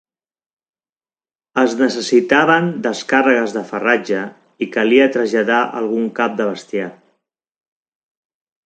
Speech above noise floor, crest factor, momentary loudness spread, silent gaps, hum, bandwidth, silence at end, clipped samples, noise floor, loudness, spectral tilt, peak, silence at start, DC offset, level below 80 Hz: over 74 dB; 18 dB; 11 LU; none; none; 9.2 kHz; 1.75 s; under 0.1%; under -90 dBFS; -16 LUFS; -5 dB/octave; 0 dBFS; 1.55 s; under 0.1%; -66 dBFS